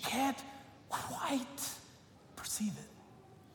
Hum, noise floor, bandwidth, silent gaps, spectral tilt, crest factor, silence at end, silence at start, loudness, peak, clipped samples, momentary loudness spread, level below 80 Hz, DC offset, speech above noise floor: none; -59 dBFS; 18 kHz; none; -3 dB/octave; 18 dB; 0 s; 0 s; -39 LUFS; -22 dBFS; under 0.1%; 22 LU; -72 dBFS; under 0.1%; 21 dB